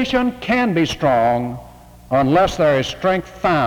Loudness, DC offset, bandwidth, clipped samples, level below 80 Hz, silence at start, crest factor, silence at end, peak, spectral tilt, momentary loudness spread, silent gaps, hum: -17 LUFS; under 0.1%; 20 kHz; under 0.1%; -40 dBFS; 0 s; 12 dB; 0 s; -4 dBFS; -6 dB/octave; 6 LU; none; none